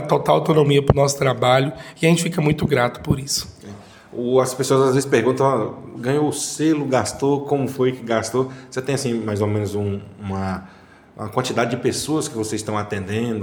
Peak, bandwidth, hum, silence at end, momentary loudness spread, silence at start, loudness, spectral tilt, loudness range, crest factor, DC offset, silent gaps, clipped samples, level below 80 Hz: 0 dBFS; 19 kHz; none; 0 s; 11 LU; 0 s; -20 LUFS; -5.5 dB/octave; 6 LU; 20 dB; under 0.1%; none; under 0.1%; -46 dBFS